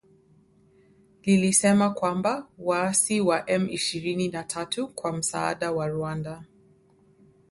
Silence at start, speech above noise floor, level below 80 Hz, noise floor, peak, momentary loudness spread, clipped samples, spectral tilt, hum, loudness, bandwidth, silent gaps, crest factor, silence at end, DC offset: 1.25 s; 34 dB; -62 dBFS; -60 dBFS; -8 dBFS; 12 LU; under 0.1%; -4 dB/octave; none; -25 LUFS; 12 kHz; none; 20 dB; 1.05 s; under 0.1%